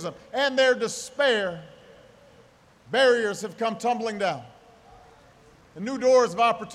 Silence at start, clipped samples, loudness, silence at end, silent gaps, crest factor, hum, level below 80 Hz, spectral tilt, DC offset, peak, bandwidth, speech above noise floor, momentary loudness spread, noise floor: 0 s; under 0.1%; -24 LUFS; 0 s; none; 18 dB; none; -66 dBFS; -3 dB/octave; under 0.1%; -8 dBFS; 13 kHz; 32 dB; 12 LU; -56 dBFS